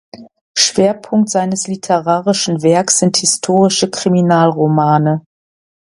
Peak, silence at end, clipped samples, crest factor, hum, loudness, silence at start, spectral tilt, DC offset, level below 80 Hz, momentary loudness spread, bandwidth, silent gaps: 0 dBFS; 0.75 s; under 0.1%; 14 dB; none; -13 LUFS; 0.15 s; -4 dB/octave; under 0.1%; -58 dBFS; 5 LU; 11.5 kHz; 0.41-0.54 s